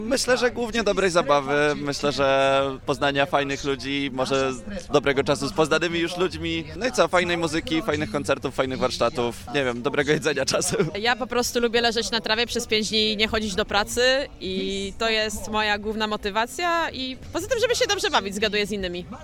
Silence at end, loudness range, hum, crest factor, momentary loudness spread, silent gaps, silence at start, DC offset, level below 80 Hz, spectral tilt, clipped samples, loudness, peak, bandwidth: 0 s; 2 LU; none; 20 dB; 6 LU; none; 0 s; under 0.1%; -44 dBFS; -3.5 dB/octave; under 0.1%; -23 LUFS; -4 dBFS; 17.5 kHz